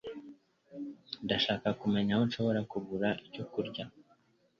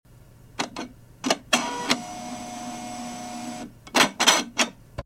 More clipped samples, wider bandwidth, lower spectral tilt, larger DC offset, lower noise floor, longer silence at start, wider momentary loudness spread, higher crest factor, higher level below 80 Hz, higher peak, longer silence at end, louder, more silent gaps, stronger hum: neither; second, 7 kHz vs 16.5 kHz; first, -7 dB/octave vs -1 dB/octave; neither; first, -69 dBFS vs -50 dBFS; about the same, 0.05 s vs 0.1 s; about the same, 16 LU vs 17 LU; second, 20 dB vs 26 dB; second, -66 dBFS vs -56 dBFS; second, -14 dBFS vs -2 dBFS; first, 0.6 s vs 0.05 s; second, -33 LUFS vs -25 LUFS; neither; neither